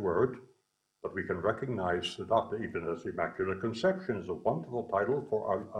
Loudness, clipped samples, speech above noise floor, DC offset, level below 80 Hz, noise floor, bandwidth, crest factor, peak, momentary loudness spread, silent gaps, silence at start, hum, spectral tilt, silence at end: -33 LUFS; under 0.1%; 44 dB; under 0.1%; -64 dBFS; -76 dBFS; 10.5 kHz; 20 dB; -12 dBFS; 6 LU; none; 0 s; none; -6.5 dB/octave; 0 s